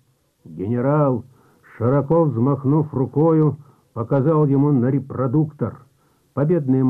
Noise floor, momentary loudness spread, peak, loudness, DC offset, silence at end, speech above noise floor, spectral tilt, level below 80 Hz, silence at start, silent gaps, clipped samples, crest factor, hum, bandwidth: -60 dBFS; 13 LU; -8 dBFS; -19 LUFS; under 0.1%; 0 s; 42 dB; -12.5 dB/octave; -58 dBFS; 0.45 s; none; under 0.1%; 12 dB; none; 2.8 kHz